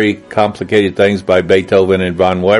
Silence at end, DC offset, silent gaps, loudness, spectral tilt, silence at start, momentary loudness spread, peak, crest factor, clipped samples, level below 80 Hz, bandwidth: 0 s; under 0.1%; none; -12 LUFS; -6.5 dB/octave; 0 s; 4 LU; 0 dBFS; 12 dB; under 0.1%; -46 dBFS; 11.5 kHz